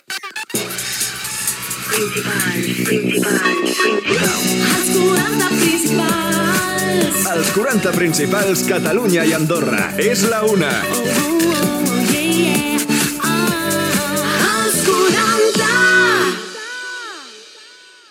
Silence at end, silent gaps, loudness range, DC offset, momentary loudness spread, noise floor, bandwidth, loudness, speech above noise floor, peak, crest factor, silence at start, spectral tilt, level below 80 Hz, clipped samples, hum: 0.4 s; none; 2 LU; under 0.1%; 7 LU; -42 dBFS; 19 kHz; -16 LUFS; 26 dB; -2 dBFS; 14 dB; 0.1 s; -3.5 dB/octave; -52 dBFS; under 0.1%; none